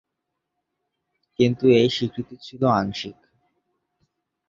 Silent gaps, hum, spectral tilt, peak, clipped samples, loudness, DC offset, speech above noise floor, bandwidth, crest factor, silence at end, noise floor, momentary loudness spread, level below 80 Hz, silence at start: none; none; -6.5 dB/octave; -6 dBFS; under 0.1%; -21 LUFS; under 0.1%; 60 dB; 7.6 kHz; 20 dB; 1.35 s; -81 dBFS; 19 LU; -58 dBFS; 1.4 s